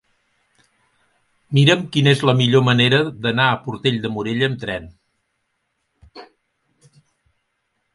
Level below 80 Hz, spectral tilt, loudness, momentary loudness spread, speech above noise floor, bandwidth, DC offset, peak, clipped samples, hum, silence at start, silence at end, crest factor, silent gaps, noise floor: -56 dBFS; -6 dB/octave; -17 LUFS; 9 LU; 55 dB; 11.5 kHz; under 0.1%; -2 dBFS; under 0.1%; none; 1.5 s; 1.7 s; 20 dB; none; -72 dBFS